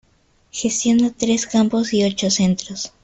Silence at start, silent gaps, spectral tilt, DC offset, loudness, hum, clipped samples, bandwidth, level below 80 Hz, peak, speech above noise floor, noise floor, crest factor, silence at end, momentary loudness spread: 0.55 s; none; -4 dB/octave; under 0.1%; -18 LUFS; none; under 0.1%; 8.4 kHz; -52 dBFS; -4 dBFS; 40 dB; -58 dBFS; 14 dB; 0.15 s; 7 LU